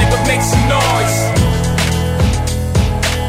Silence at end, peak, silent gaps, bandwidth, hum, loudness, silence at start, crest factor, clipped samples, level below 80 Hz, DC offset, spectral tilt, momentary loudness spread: 0 s; 0 dBFS; none; 16.5 kHz; none; -14 LUFS; 0 s; 14 dB; under 0.1%; -22 dBFS; under 0.1%; -4.5 dB/octave; 3 LU